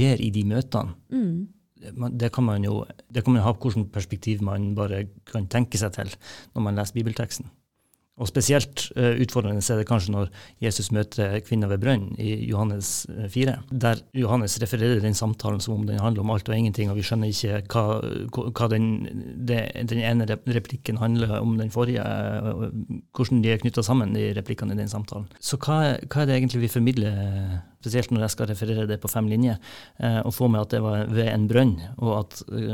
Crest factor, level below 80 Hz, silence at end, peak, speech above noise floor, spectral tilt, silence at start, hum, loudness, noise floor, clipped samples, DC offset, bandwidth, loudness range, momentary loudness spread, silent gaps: 18 dB; -50 dBFS; 0 s; -6 dBFS; 44 dB; -6 dB/octave; 0 s; none; -25 LUFS; -68 dBFS; under 0.1%; 0.2%; 17.5 kHz; 2 LU; 9 LU; none